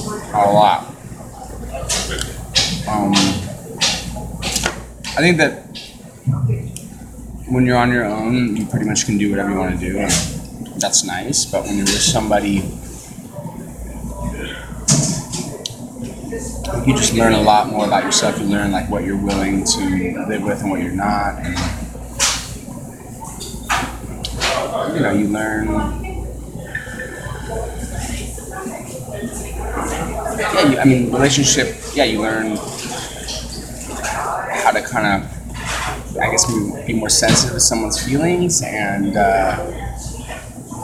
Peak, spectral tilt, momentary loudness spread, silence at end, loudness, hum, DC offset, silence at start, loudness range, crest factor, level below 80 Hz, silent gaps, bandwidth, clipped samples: 0 dBFS; -3.5 dB/octave; 16 LU; 0 s; -18 LUFS; none; under 0.1%; 0 s; 6 LU; 18 dB; -34 dBFS; none; 17 kHz; under 0.1%